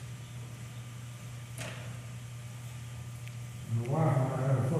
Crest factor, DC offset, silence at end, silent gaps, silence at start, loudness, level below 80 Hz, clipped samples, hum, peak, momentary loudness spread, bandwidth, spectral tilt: 18 dB; under 0.1%; 0 s; none; 0 s; -36 LUFS; -60 dBFS; under 0.1%; none; -18 dBFS; 15 LU; 14.5 kHz; -7 dB/octave